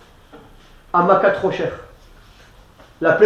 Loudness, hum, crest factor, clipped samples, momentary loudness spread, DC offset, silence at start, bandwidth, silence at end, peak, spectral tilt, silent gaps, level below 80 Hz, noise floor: -18 LUFS; none; 20 dB; under 0.1%; 12 LU; under 0.1%; 0.35 s; 8.6 kHz; 0 s; 0 dBFS; -7 dB/octave; none; -50 dBFS; -47 dBFS